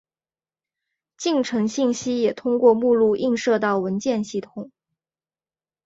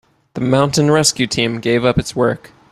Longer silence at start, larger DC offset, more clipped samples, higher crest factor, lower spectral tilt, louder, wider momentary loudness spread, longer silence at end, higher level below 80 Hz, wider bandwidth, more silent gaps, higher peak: first, 1.2 s vs 0.35 s; neither; neither; about the same, 18 dB vs 16 dB; about the same, -5 dB/octave vs -4.5 dB/octave; second, -21 LUFS vs -15 LUFS; first, 12 LU vs 9 LU; first, 1.2 s vs 0.35 s; second, -66 dBFS vs -42 dBFS; second, 7.8 kHz vs 15 kHz; neither; second, -4 dBFS vs 0 dBFS